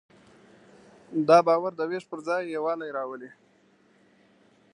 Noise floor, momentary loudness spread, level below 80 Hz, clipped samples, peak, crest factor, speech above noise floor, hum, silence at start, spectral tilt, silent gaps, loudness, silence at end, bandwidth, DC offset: -62 dBFS; 17 LU; -80 dBFS; under 0.1%; -4 dBFS; 24 dB; 37 dB; none; 1.1 s; -6 dB/octave; none; -26 LUFS; 1.45 s; 10 kHz; under 0.1%